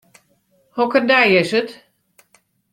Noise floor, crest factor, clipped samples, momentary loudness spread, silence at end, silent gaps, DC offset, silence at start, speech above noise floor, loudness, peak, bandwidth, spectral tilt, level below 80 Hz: -61 dBFS; 18 dB; under 0.1%; 17 LU; 1 s; none; under 0.1%; 0.75 s; 45 dB; -15 LUFS; -2 dBFS; 14 kHz; -5 dB/octave; -62 dBFS